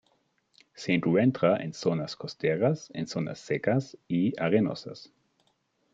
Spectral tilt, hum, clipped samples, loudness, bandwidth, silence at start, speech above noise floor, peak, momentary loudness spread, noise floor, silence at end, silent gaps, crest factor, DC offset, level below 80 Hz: -7 dB/octave; none; under 0.1%; -28 LUFS; 7.8 kHz; 0.75 s; 45 dB; -8 dBFS; 12 LU; -72 dBFS; 0.9 s; none; 20 dB; under 0.1%; -70 dBFS